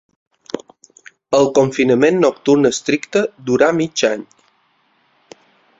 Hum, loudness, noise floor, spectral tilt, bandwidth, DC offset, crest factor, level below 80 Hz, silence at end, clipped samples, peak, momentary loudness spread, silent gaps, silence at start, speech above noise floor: none; -15 LUFS; -60 dBFS; -5 dB/octave; 8 kHz; under 0.1%; 16 dB; -58 dBFS; 1.55 s; under 0.1%; -2 dBFS; 15 LU; none; 0.55 s; 45 dB